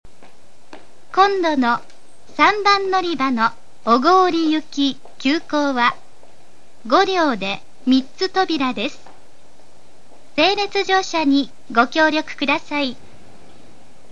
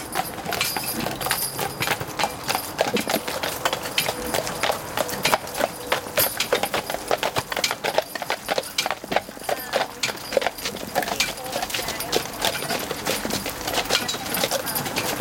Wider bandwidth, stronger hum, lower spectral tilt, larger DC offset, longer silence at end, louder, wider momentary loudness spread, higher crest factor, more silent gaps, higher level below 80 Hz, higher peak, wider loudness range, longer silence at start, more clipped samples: second, 10 kHz vs 17 kHz; neither; first, -3.5 dB/octave vs -2 dB/octave; first, 3% vs under 0.1%; first, 1.2 s vs 0 s; first, -18 LUFS vs -24 LUFS; first, 10 LU vs 4 LU; about the same, 20 dB vs 22 dB; neither; second, -60 dBFS vs -52 dBFS; first, 0 dBFS vs -4 dBFS; about the same, 4 LU vs 2 LU; first, 0.75 s vs 0 s; neither